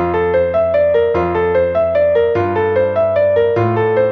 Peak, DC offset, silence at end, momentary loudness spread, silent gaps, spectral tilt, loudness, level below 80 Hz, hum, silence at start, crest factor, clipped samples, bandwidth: -4 dBFS; under 0.1%; 0 s; 2 LU; none; -9 dB/octave; -14 LUFS; -42 dBFS; none; 0 s; 10 dB; under 0.1%; 5.8 kHz